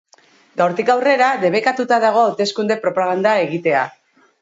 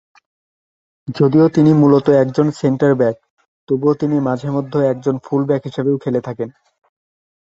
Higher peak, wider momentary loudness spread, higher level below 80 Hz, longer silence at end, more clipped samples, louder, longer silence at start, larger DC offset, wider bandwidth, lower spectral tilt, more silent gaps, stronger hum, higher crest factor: about the same, -4 dBFS vs -2 dBFS; second, 5 LU vs 13 LU; second, -70 dBFS vs -58 dBFS; second, 0.5 s vs 1 s; neither; about the same, -17 LUFS vs -16 LUFS; second, 0.55 s vs 1.05 s; neither; about the same, 8 kHz vs 7.8 kHz; second, -5 dB/octave vs -9 dB/octave; second, none vs 3.30-3.37 s, 3.48-3.67 s; neither; about the same, 14 dB vs 16 dB